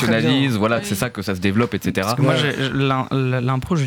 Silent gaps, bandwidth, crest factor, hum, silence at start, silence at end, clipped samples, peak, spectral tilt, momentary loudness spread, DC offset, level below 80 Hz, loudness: none; 18.5 kHz; 14 dB; none; 0 s; 0 s; under 0.1%; -4 dBFS; -6 dB/octave; 5 LU; under 0.1%; -48 dBFS; -19 LUFS